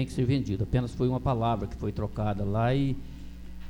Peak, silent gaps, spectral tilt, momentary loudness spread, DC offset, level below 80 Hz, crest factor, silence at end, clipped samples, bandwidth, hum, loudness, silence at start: -12 dBFS; none; -8 dB/octave; 11 LU; under 0.1%; -40 dBFS; 16 dB; 0 s; under 0.1%; 11.5 kHz; none; -29 LUFS; 0 s